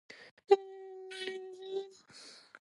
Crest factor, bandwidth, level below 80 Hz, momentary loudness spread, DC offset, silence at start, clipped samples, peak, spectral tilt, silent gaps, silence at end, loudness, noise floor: 26 dB; 11.5 kHz; under -90 dBFS; 23 LU; under 0.1%; 0.1 s; under 0.1%; -12 dBFS; -3 dB/octave; 0.31-0.37 s; 0.05 s; -35 LUFS; -56 dBFS